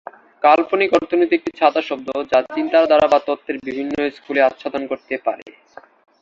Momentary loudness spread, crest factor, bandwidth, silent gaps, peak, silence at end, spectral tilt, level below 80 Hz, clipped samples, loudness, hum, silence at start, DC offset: 11 LU; 18 dB; 7.4 kHz; 5.42-5.46 s; 0 dBFS; 0.7 s; -5 dB/octave; -58 dBFS; under 0.1%; -18 LUFS; none; 0.4 s; under 0.1%